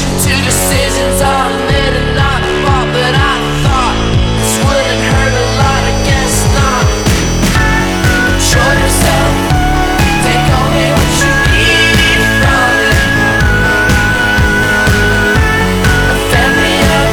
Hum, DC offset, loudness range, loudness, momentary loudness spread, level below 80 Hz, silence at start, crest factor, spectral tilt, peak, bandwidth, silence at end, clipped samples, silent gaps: none; under 0.1%; 3 LU; -10 LUFS; 3 LU; -18 dBFS; 0 s; 10 dB; -4 dB/octave; 0 dBFS; over 20 kHz; 0 s; under 0.1%; none